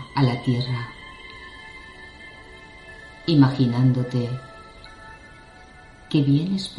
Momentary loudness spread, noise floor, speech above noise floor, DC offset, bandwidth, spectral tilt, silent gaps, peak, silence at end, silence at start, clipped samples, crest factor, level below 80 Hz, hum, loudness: 24 LU; -46 dBFS; 26 dB; under 0.1%; 11 kHz; -7.5 dB/octave; none; -4 dBFS; 0 s; 0 s; under 0.1%; 20 dB; -52 dBFS; none; -22 LUFS